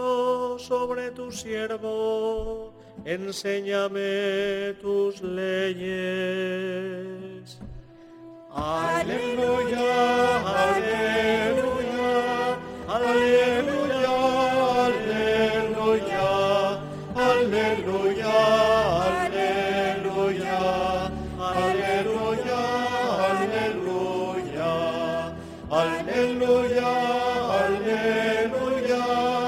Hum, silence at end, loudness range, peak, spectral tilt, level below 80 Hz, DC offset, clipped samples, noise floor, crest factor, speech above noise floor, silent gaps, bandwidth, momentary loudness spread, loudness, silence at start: none; 0 s; 6 LU; -8 dBFS; -5 dB/octave; -50 dBFS; under 0.1%; under 0.1%; -46 dBFS; 18 dB; 21 dB; none; 16 kHz; 10 LU; -24 LUFS; 0 s